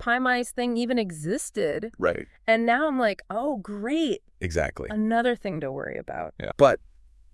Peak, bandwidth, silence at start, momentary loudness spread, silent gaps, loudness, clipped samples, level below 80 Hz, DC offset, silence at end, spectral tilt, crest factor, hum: -4 dBFS; 12 kHz; 0 s; 11 LU; none; -26 LUFS; under 0.1%; -50 dBFS; under 0.1%; 0.55 s; -5 dB/octave; 22 dB; none